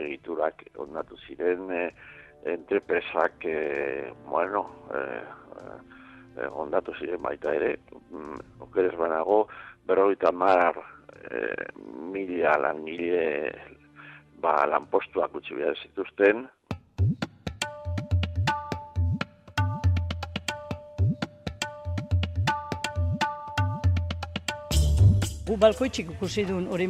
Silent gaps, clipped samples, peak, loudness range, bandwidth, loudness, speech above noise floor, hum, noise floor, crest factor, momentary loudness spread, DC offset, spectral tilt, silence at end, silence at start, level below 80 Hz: none; under 0.1%; -6 dBFS; 7 LU; 14 kHz; -28 LUFS; 22 dB; none; -49 dBFS; 22 dB; 17 LU; under 0.1%; -6 dB/octave; 0 s; 0 s; -42 dBFS